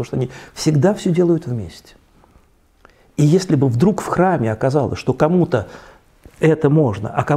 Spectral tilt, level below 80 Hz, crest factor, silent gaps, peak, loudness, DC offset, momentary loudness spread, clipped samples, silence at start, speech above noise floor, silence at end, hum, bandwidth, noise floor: -7.5 dB/octave; -48 dBFS; 16 dB; none; 0 dBFS; -17 LUFS; under 0.1%; 11 LU; under 0.1%; 0 s; 36 dB; 0 s; none; 13.5 kHz; -53 dBFS